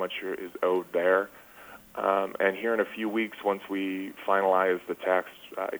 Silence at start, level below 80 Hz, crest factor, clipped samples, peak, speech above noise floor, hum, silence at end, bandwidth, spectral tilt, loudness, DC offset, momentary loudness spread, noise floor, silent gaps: 0 s; -72 dBFS; 18 dB; under 0.1%; -10 dBFS; 22 dB; none; 0 s; over 20 kHz; -5.5 dB/octave; -28 LUFS; under 0.1%; 11 LU; -50 dBFS; none